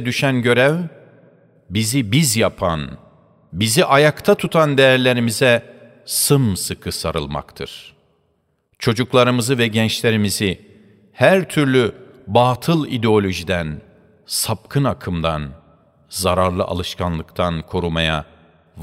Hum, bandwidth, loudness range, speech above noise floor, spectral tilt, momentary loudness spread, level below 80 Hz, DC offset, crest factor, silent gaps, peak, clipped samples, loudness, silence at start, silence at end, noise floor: none; 16 kHz; 6 LU; 48 dB; -4.5 dB/octave; 12 LU; -44 dBFS; under 0.1%; 18 dB; none; 0 dBFS; under 0.1%; -17 LUFS; 0 s; 0 s; -65 dBFS